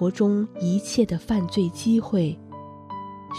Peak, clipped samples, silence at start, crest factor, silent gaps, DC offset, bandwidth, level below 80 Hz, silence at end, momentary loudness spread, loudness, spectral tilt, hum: -8 dBFS; under 0.1%; 0 s; 16 dB; none; under 0.1%; 13.5 kHz; -52 dBFS; 0 s; 16 LU; -24 LUFS; -6.5 dB/octave; none